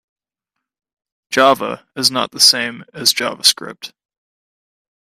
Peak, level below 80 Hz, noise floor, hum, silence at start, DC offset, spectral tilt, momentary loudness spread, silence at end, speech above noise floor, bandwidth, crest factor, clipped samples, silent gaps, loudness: 0 dBFS; -64 dBFS; -80 dBFS; none; 1.3 s; under 0.1%; -1 dB/octave; 16 LU; 1.25 s; 64 dB; 16 kHz; 20 dB; under 0.1%; none; -14 LUFS